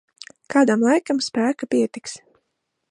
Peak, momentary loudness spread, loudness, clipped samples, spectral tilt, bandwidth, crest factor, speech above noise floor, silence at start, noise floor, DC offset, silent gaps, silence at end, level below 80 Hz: -4 dBFS; 17 LU; -20 LUFS; under 0.1%; -4.5 dB/octave; 11.5 kHz; 18 dB; 56 dB; 0.5 s; -76 dBFS; under 0.1%; none; 0.75 s; -72 dBFS